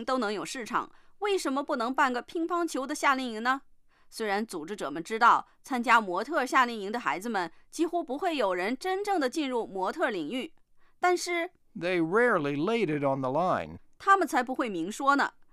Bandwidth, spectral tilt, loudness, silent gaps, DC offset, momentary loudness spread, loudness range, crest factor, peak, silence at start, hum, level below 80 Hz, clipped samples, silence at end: 15.5 kHz; -4 dB/octave; -29 LUFS; none; under 0.1%; 11 LU; 3 LU; 20 dB; -10 dBFS; 0 s; none; -64 dBFS; under 0.1%; 0.2 s